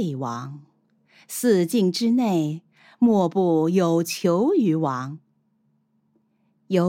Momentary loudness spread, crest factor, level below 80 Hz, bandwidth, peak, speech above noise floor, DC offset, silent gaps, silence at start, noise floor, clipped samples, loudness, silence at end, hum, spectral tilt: 14 LU; 14 dB; -78 dBFS; 17 kHz; -8 dBFS; 46 dB; under 0.1%; none; 0 s; -67 dBFS; under 0.1%; -22 LUFS; 0 s; none; -6.5 dB/octave